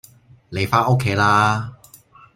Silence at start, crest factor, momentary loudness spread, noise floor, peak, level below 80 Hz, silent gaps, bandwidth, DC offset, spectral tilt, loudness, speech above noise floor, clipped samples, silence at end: 0.5 s; 18 dB; 14 LU; -48 dBFS; -2 dBFS; -52 dBFS; none; 16 kHz; under 0.1%; -5.5 dB/octave; -18 LUFS; 31 dB; under 0.1%; 0.6 s